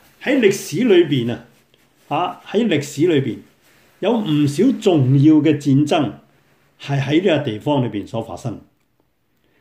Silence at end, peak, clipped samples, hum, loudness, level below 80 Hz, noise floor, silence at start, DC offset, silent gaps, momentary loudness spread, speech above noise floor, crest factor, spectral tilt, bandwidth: 1 s; -2 dBFS; under 0.1%; none; -17 LUFS; -60 dBFS; -65 dBFS; 0.2 s; under 0.1%; none; 14 LU; 49 dB; 16 dB; -6.5 dB/octave; 16 kHz